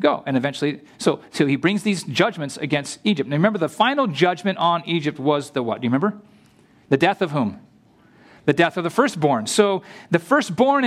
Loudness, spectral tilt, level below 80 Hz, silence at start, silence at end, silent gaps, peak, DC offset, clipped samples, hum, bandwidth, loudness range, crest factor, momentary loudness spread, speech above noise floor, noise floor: -21 LUFS; -5 dB/octave; -66 dBFS; 0 s; 0 s; none; -2 dBFS; under 0.1%; under 0.1%; none; 14.5 kHz; 2 LU; 18 dB; 5 LU; 33 dB; -54 dBFS